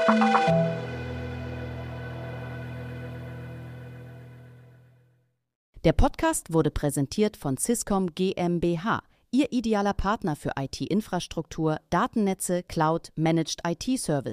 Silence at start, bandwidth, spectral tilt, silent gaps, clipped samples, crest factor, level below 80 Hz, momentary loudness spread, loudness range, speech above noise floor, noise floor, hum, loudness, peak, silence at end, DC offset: 0 s; 15.5 kHz; -5.5 dB/octave; 5.55-5.73 s; under 0.1%; 20 dB; -40 dBFS; 14 LU; 12 LU; 42 dB; -68 dBFS; none; -27 LUFS; -6 dBFS; 0 s; under 0.1%